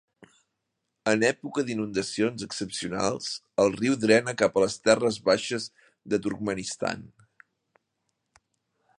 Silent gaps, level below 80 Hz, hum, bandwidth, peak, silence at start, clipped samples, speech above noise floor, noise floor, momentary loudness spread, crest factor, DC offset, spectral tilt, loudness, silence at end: none; -64 dBFS; none; 11 kHz; -4 dBFS; 1.05 s; under 0.1%; 55 dB; -81 dBFS; 10 LU; 22 dB; under 0.1%; -4 dB/octave; -26 LUFS; 1.9 s